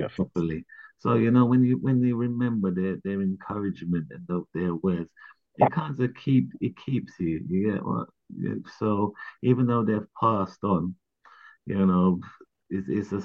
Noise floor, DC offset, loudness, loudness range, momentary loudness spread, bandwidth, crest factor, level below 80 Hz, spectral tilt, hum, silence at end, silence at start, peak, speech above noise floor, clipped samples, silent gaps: -54 dBFS; under 0.1%; -26 LUFS; 4 LU; 11 LU; 6.6 kHz; 20 dB; -60 dBFS; -10 dB/octave; none; 0 s; 0 s; -6 dBFS; 28 dB; under 0.1%; none